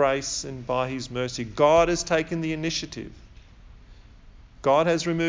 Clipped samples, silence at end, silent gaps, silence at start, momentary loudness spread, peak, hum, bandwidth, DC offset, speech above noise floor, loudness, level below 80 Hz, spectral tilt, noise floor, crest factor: under 0.1%; 0 s; none; 0 s; 11 LU; -6 dBFS; none; 7.6 kHz; under 0.1%; 24 dB; -24 LUFS; -48 dBFS; -4.5 dB/octave; -48 dBFS; 18 dB